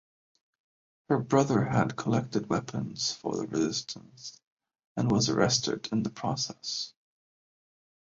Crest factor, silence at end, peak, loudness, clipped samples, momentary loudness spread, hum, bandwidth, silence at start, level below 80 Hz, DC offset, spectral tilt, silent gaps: 22 dB; 1.2 s; -8 dBFS; -29 LUFS; under 0.1%; 15 LU; none; 7.8 kHz; 1.1 s; -62 dBFS; under 0.1%; -4.5 dB/octave; 4.47-4.57 s, 4.87-4.95 s